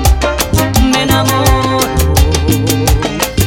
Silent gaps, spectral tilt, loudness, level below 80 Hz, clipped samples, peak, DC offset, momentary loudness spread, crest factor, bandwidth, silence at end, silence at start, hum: none; -4.5 dB/octave; -11 LUFS; -16 dBFS; under 0.1%; 0 dBFS; under 0.1%; 3 LU; 10 dB; 18 kHz; 0 s; 0 s; none